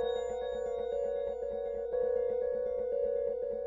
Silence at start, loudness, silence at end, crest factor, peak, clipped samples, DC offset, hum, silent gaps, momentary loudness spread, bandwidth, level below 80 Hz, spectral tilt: 0 s; -34 LUFS; 0 s; 12 dB; -22 dBFS; under 0.1%; under 0.1%; none; none; 4 LU; 7.4 kHz; -58 dBFS; -5 dB/octave